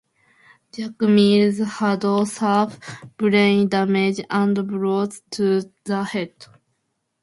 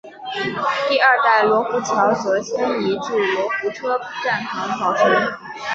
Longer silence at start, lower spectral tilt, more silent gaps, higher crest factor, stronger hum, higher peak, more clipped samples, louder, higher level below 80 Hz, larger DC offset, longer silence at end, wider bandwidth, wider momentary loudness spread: first, 0.75 s vs 0.05 s; first, -6 dB/octave vs -4 dB/octave; neither; about the same, 18 dB vs 18 dB; neither; about the same, -4 dBFS vs -2 dBFS; neither; about the same, -20 LUFS vs -19 LUFS; about the same, -64 dBFS vs -62 dBFS; neither; first, 0.95 s vs 0 s; first, 11.5 kHz vs 8 kHz; first, 13 LU vs 9 LU